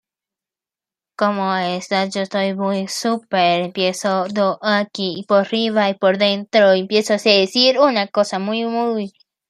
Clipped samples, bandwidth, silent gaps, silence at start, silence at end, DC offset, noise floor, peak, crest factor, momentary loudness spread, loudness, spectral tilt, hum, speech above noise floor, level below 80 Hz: under 0.1%; 13 kHz; none; 1.2 s; 0.4 s; under 0.1%; -90 dBFS; 0 dBFS; 18 dB; 7 LU; -18 LUFS; -4.5 dB/octave; none; 72 dB; -68 dBFS